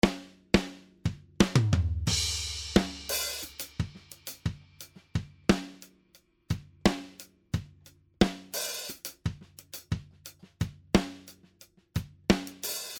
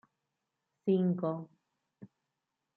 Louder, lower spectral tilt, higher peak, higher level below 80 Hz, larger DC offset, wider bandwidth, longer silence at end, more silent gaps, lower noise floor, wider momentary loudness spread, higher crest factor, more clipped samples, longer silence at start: about the same, -31 LUFS vs -33 LUFS; second, -4.5 dB/octave vs -11.5 dB/octave; first, -4 dBFS vs -20 dBFS; first, -44 dBFS vs -84 dBFS; neither; first, over 20 kHz vs 4.2 kHz; second, 0 s vs 0.7 s; neither; second, -64 dBFS vs -87 dBFS; first, 17 LU vs 14 LU; first, 28 dB vs 18 dB; neither; second, 0.05 s vs 0.85 s